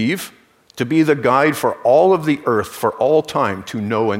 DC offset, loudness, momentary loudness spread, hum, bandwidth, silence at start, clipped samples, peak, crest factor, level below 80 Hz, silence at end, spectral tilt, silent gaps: under 0.1%; -17 LUFS; 10 LU; none; 16 kHz; 0 s; under 0.1%; -2 dBFS; 14 dB; -58 dBFS; 0 s; -6 dB/octave; none